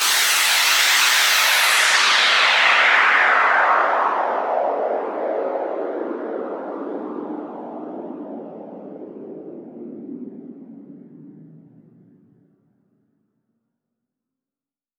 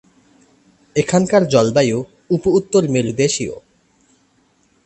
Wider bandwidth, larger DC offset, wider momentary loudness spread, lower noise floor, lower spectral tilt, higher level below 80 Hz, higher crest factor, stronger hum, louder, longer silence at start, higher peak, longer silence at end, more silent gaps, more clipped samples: first, over 20 kHz vs 8.8 kHz; neither; first, 23 LU vs 10 LU; first, under -90 dBFS vs -59 dBFS; second, 0.5 dB/octave vs -5.5 dB/octave; second, under -90 dBFS vs -50 dBFS; about the same, 18 dB vs 18 dB; neither; about the same, -16 LUFS vs -17 LUFS; second, 0 s vs 0.95 s; about the same, -2 dBFS vs 0 dBFS; first, 3.4 s vs 1.25 s; neither; neither